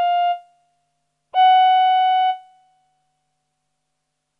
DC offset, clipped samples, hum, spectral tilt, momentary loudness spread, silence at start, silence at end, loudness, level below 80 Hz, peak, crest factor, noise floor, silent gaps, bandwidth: under 0.1%; under 0.1%; none; 1 dB/octave; 13 LU; 0 s; 2 s; -16 LUFS; -88 dBFS; -8 dBFS; 12 dB; -76 dBFS; none; 4.7 kHz